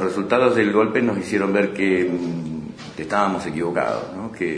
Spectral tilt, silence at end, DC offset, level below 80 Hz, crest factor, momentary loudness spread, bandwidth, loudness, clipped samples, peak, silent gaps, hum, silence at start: -6.5 dB/octave; 0 s; under 0.1%; -56 dBFS; 18 dB; 13 LU; 10.5 kHz; -21 LUFS; under 0.1%; -2 dBFS; none; none; 0 s